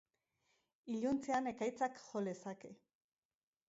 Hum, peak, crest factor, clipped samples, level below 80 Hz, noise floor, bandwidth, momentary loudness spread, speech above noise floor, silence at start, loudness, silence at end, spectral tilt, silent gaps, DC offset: none; -26 dBFS; 18 dB; under 0.1%; -78 dBFS; -83 dBFS; 7.6 kHz; 16 LU; 42 dB; 0.85 s; -41 LUFS; 0.95 s; -5 dB/octave; none; under 0.1%